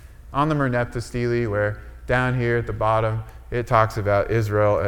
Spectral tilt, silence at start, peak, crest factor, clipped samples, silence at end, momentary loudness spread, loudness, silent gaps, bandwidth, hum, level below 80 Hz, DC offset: -7.5 dB/octave; 0 s; -2 dBFS; 20 dB; under 0.1%; 0 s; 9 LU; -22 LUFS; none; 16 kHz; none; -38 dBFS; under 0.1%